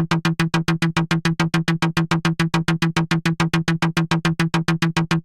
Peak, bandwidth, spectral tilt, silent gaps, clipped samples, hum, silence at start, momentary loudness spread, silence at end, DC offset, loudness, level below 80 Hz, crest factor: -8 dBFS; 12.5 kHz; -5.5 dB/octave; none; under 0.1%; none; 0 s; 1 LU; 0.05 s; under 0.1%; -20 LUFS; -46 dBFS; 12 dB